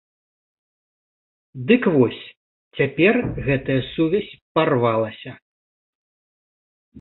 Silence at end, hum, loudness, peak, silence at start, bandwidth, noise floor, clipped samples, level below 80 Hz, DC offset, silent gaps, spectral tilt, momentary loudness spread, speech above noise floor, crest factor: 0 s; none; -20 LUFS; -2 dBFS; 1.55 s; 4.2 kHz; under -90 dBFS; under 0.1%; -48 dBFS; under 0.1%; 2.37-2.71 s, 4.42-4.55 s, 5.42-6.92 s; -11.5 dB/octave; 17 LU; over 70 dB; 20 dB